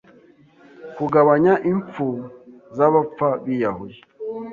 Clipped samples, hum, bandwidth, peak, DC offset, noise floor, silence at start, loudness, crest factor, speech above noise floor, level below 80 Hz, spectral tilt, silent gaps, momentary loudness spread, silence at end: under 0.1%; none; 7 kHz; -2 dBFS; under 0.1%; -51 dBFS; 0.8 s; -19 LUFS; 18 dB; 32 dB; -60 dBFS; -9.5 dB/octave; none; 20 LU; 0 s